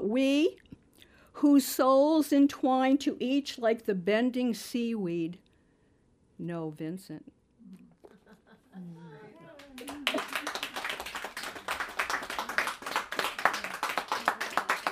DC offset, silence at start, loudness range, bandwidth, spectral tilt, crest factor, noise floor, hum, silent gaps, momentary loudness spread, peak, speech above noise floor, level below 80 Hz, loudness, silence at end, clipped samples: under 0.1%; 0 s; 17 LU; 15.5 kHz; -4 dB/octave; 26 dB; -66 dBFS; none; none; 20 LU; -6 dBFS; 39 dB; -68 dBFS; -29 LUFS; 0 s; under 0.1%